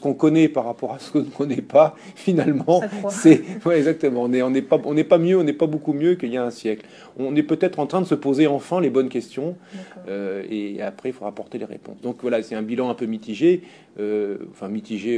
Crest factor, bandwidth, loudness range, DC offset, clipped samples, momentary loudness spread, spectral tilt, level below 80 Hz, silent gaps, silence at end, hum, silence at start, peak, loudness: 20 dB; 10.5 kHz; 9 LU; under 0.1%; under 0.1%; 15 LU; -7 dB/octave; -70 dBFS; none; 0 s; none; 0 s; 0 dBFS; -21 LUFS